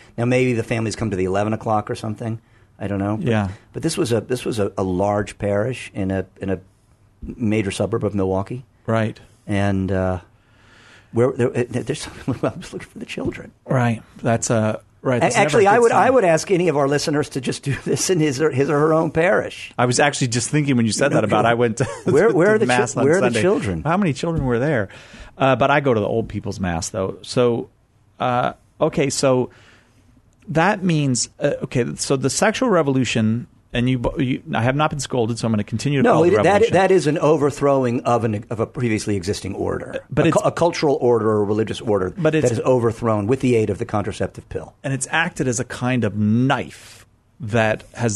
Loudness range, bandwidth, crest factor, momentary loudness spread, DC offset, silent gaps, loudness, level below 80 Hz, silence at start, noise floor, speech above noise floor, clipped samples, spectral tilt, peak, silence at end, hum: 6 LU; 12.5 kHz; 18 dB; 11 LU; under 0.1%; none; -20 LUFS; -48 dBFS; 0.15 s; -55 dBFS; 36 dB; under 0.1%; -5.5 dB/octave; -2 dBFS; 0 s; none